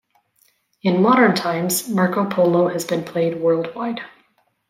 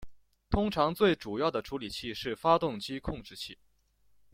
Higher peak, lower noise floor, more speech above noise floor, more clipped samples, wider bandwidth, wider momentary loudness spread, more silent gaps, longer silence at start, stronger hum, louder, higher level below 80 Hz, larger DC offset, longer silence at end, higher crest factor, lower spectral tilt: first, -2 dBFS vs -10 dBFS; second, -62 dBFS vs -69 dBFS; first, 44 dB vs 38 dB; neither; about the same, 16.5 kHz vs 16.5 kHz; about the same, 12 LU vs 13 LU; neither; first, 0.85 s vs 0 s; neither; first, -19 LUFS vs -31 LUFS; second, -66 dBFS vs -50 dBFS; neither; second, 0.65 s vs 0.8 s; about the same, 18 dB vs 22 dB; about the same, -5 dB/octave vs -6 dB/octave